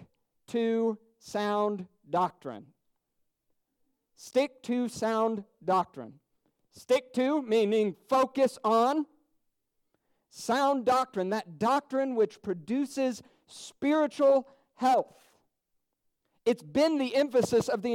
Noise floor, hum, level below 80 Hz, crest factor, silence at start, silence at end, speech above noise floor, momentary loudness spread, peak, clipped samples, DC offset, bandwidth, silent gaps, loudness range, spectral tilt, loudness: -80 dBFS; none; -72 dBFS; 16 dB; 0.5 s; 0 s; 52 dB; 13 LU; -14 dBFS; under 0.1%; under 0.1%; 16 kHz; none; 6 LU; -5 dB/octave; -29 LUFS